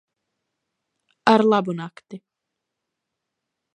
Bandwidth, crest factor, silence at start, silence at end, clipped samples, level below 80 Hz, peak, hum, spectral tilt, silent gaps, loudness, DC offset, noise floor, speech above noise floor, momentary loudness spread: 9.4 kHz; 24 dB; 1.25 s; 1.6 s; under 0.1%; -76 dBFS; 0 dBFS; none; -6.5 dB/octave; none; -19 LUFS; under 0.1%; -82 dBFS; 62 dB; 16 LU